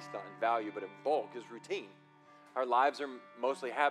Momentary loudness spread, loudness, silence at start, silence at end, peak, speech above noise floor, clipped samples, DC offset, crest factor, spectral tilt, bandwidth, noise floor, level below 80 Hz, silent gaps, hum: 15 LU; -35 LUFS; 0 s; 0 s; -16 dBFS; 26 dB; under 0.1%; under 0.1%; 20 dB; -4 dB/octave; 12 kHz; -60 dBFS; under -90 dBFS; none; none